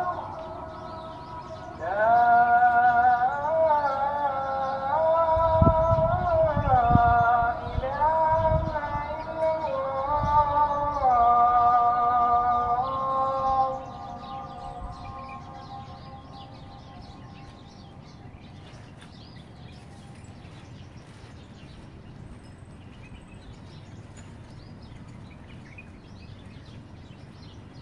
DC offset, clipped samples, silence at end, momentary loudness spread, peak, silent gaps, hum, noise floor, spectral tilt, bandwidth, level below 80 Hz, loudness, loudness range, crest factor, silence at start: under 0.1%; under 0.1%; 0 s; 26 LU; -4 dBFS; none; none; -45 dBFS; -7.5 dB/octave; 7.4 kHz; -42 dBFS; -23 LUFS; 23 LU; 22 dB; 0 s